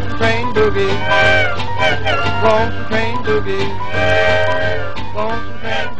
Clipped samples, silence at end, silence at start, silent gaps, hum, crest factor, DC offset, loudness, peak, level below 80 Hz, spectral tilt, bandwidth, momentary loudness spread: under 0.1%; 0 s; 0 s; none; none; 16 dB; 10%; -16 LUFS; 0 dBFS; -34 dBFS; -5.5 dB/octave; 9.2 kHz; 9 LU